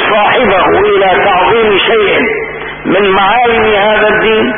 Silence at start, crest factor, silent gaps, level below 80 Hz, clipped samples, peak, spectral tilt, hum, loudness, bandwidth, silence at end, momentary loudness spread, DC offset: 0 s; 8 dB; none; -36 dBFS; under 0.1%; 0 dBFS; -8 dB/octave; none; -8 LUFS; 3.7 kHz; 0 s; 5 LU; under 0.1%